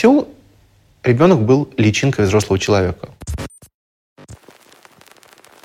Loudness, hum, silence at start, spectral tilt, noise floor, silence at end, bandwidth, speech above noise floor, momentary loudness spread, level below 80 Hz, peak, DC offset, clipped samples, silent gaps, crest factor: -15 LUFS; none; 0 s; -6 dB/octave; -52 dBFS; 1.3 s; 15 kHz; 38 dB; 17 LU; -42 dBFS; 0 dBFS; under 0.1%; under 0.1%; 3.74-4.16 s; 16 dB